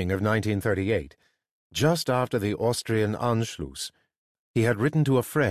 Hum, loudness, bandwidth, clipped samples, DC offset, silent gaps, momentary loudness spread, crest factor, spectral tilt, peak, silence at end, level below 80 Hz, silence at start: none; -26 LUFS; 14.5 kHz; under 0.1%; under 0.1%; 1.51-1.70 s, 4.17-4.54 s; 11 LU; 16 dB; -6 dB/octave; -10 dBFS; 0 s; -48 dBFS; 0 s